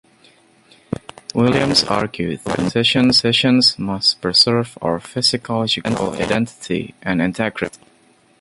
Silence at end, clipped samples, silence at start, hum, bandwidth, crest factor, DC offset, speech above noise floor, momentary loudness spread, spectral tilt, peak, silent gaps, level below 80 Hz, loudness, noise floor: 0.65 s; under 0.1%; 1.35 s; none; 11.5 kHz; 18 dB; under 0.1%; 36 dB; 12 LU; -4.5 dB/octave; 0 dBFS; none; -48 dBFS; -17 LUFS; -54 dBFS